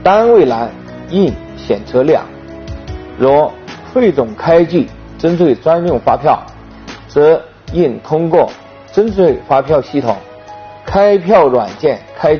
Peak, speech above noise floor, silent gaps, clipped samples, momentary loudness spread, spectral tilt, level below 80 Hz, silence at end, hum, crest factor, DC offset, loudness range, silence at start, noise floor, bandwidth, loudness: 0 dBFS; 21 dB; none; under 0.1%; 19 LU; -6 dB/octave; -38 dBFS; 0 s; none; 12 dB; under 0.1%; 2 LU; 0 s; -32 dBFS; 6.6 kHz; -12 LUFS